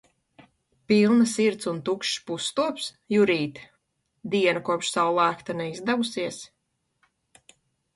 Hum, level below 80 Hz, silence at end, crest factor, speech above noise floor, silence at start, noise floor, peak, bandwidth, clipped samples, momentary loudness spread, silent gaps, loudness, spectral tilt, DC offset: none; -68 dBFS; 1.5 s; 18 dB; 52 dB; 0.9 s; -76 dBFS; -8 dBFS; 11.5 kHz; under 0.1%; 11 LU; none; -25 LUFS; -4.5 dB/octave; under 0.1%